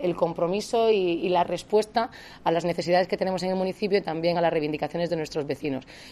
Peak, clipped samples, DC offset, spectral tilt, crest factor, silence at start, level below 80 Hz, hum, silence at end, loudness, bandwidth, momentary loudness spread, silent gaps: -10 dBFS; under 0.1%; under 0.1%; -5.5 dB/octave; 16 dB; 0 s; -58 dBFS; none; 0 s; -26 LUFS; 13.5 kHz; 7 LU; none